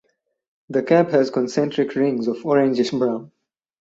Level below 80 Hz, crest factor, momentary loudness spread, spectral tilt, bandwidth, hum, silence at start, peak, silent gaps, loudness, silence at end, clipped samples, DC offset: -66 dBFS; 18 dB; 7 LU; -6.5 dB/octave; 7.8 kHz; none; 0.7 s; -2 dBFS; none; -20 LUFS; 0.55 s; under 0.1%; under 0.1%